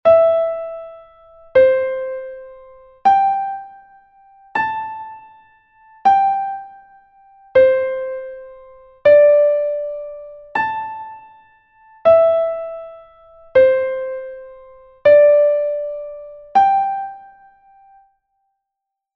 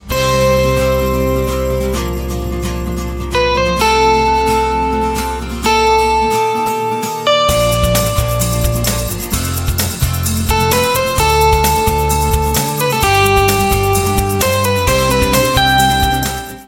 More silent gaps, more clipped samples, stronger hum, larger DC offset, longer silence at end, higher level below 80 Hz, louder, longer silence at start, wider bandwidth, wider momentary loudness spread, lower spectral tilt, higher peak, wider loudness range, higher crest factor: neither; neither; neither; neither; first, 1.95 s vs 0.05 s; second, -56 dBFS vs -24 dBFS; about the same, -16 LUFS vs -14 LUFS; about the same, 0.05 s vs 0.05 s; second, 6 kHz vs 17 kHz; first, 21 LU vs 7 LU; first, -6 dB/octave vs -4 dB/octave; about the same, -2 dBFS vs 0 dBFS; about the same, 5 LU vs 3 LU; about the same, 16 dB vs 14 dB